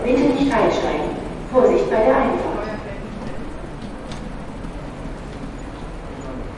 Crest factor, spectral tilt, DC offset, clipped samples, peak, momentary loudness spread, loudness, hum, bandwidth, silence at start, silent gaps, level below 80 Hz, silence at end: 20 dB; -6.5 dB/octave; under 0.1%; under 0.1%; -2 dBFS; 17 LU; -20 LUFS; none; 11 kHz; 0 s; none; -34 dBFS; 0 s